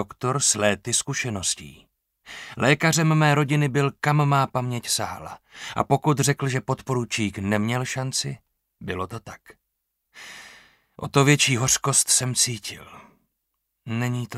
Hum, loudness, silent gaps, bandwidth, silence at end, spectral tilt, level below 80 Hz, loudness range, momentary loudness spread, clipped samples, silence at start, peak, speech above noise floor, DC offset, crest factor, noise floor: none; -22 LUFS; none; 15.5 kHz; 0 s; -3.5 dB/octave; -58 dBFS; 7 LU; 19 LU; under 0.1%; 0 s; -4 dBFS; 55 dB; under 0.1%; 20 dB; -78 dBFS